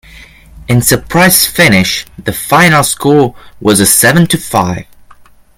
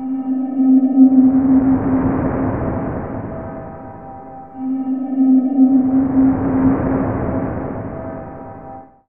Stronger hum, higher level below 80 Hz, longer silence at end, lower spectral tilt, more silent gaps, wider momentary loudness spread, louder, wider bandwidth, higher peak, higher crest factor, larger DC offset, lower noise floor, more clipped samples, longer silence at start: neither; about the same, -36 dBFS vs -38 dBFS; first, 0.75 s vs 0.25 s; second, -3.5 dB/octave vs -14 dB/octave; neither; second, 10 LU vs 21 LU; first, -8 LUFS vs -16 LUFS; first, over 20 kHz vs 2.6 kHz; about the same, 0 dBFS vs 0 dBFS; second, 10 dB vs 16 dB; second, under 0.1% vs 0.4%; about the same, -39 dBFS vs -36 dBFS; first, 0.4% vs under 0.1%; first, 0.15 s vs 0 s